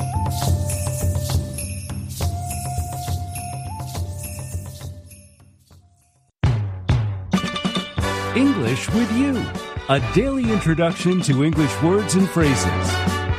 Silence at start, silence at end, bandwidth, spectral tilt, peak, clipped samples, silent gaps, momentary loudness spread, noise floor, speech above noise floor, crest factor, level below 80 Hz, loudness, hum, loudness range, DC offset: 0 s; 0 s; 15.5 kHz; -5.5 dB/octave; -4 dBFS; under 0.1%; none; 12 LU; -60 dBFS; 41 dB; 18 dB; -34 dBFS; -22 LUFS; none; 10 LU; under 0.1%